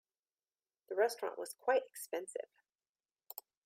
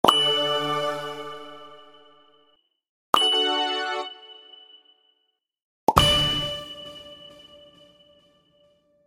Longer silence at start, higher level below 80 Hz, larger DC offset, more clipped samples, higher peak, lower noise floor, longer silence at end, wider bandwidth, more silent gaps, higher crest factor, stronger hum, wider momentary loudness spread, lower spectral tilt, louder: first, 0.9 s vs 0.05 s; second, under -90 dBFS vs -46 dBFS; neither; neither; second, -20 dBFS vs 0 dBFS; first, under -90 dBFS vs -74 dBFS; second, 0.25 s vs 1.75 s; about the same, 16 kHz vs 16.5 kHz; second, 2.75-2.79 s, 2.89-2.95 s vs 2.89-3.13 s, 5.63-5.87 s; second, 20 dB vs 26 dB; neither; second, 16 LU vs 25 LU; second, -1 dB/octave vs -3 dB/octave; second, -38 LUFS vs -22 LUFS